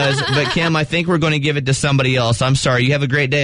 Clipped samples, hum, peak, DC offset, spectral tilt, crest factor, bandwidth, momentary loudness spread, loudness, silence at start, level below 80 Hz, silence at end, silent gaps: under 0.1%; none; -4 dBFS; under 0.1%; -5 dB/octave; 12 dB; 11 kHz; 2 LU; -16 LUFS; 0 s; -40 dBFS; 0 s; none